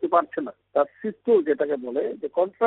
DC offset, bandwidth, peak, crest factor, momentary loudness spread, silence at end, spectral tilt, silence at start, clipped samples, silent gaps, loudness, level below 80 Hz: under 0.1%; 4 kHz; -6 dBFS; 18 dB; 9 LU; 0 s; -5 dB/octave; 0 s; under 0.1%; none; -25 LUFS; -74 dBFS